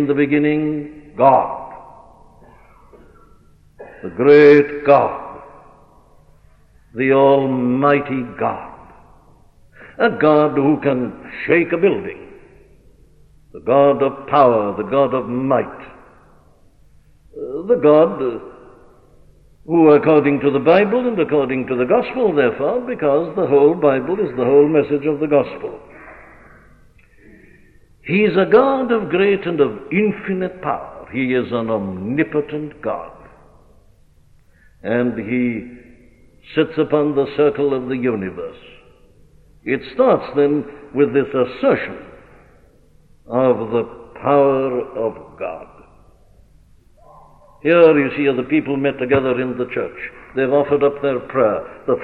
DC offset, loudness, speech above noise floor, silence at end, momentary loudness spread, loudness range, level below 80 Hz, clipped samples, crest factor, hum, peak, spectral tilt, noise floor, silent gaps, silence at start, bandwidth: under 0.1%; -17 LUFS; 34 dB; 0 s; 16 LU; 7 LU; -52 dBFS; under 0.1%; 16 dB; none; -2 dBFS; -9 dB/octave; -50 dBFS; none; 0 s; 5.4 kHz